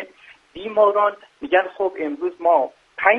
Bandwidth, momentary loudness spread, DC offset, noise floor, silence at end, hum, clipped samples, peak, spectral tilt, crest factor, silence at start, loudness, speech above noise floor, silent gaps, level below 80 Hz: 5.4 kHz; 14 LU; under 0.1%; -48 dBFS; 0 s; none; under 0.1%; 0 dBFS; -5.5 dB/octave; 20 dB; 0 s; -20 LUFS; 28 dB; none; -64 dBFS